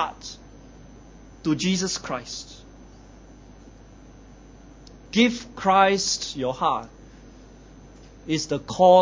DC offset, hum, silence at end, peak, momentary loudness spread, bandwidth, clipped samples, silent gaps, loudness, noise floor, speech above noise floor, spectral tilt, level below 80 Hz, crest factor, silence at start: under 0.1%; none; 0 s; -4 dBFS; 22 LU; 7.8 kHz; under 0.1%; none; -23 LUFS; -47 dBFS; 25 dB; -4 dB/octave; -50 dBFS; 22 dB; 0 s